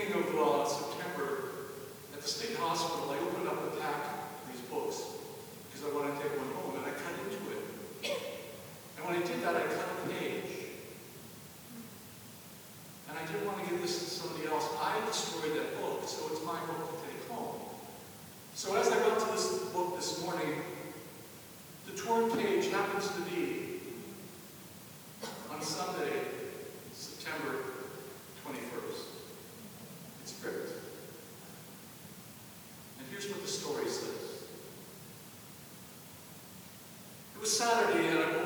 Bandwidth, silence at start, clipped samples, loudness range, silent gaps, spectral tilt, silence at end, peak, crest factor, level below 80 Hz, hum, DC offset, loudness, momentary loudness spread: over 20 kHz; 0 s; under 0.1%; 9 LU; none; -3.5 dB/octave; 0 s; -14 dBFS; 22 dB; -76 dBFS; none; under 0.1%; -36 LUFS; 18 LU